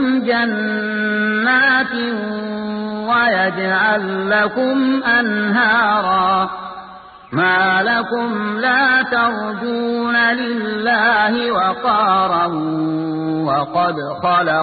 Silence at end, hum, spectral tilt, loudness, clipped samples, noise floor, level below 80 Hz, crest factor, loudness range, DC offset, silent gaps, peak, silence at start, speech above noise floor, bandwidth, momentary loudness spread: 0 s; none; -10.5 dB/octave; -16 LUFS; under 0.1%; -38 dBFS; -54 dBFS; 14 dB; 2 LU; under 0.1%; none; -2 dBFS; 0 s; 21 dB; 4.8 kHz; 8 LU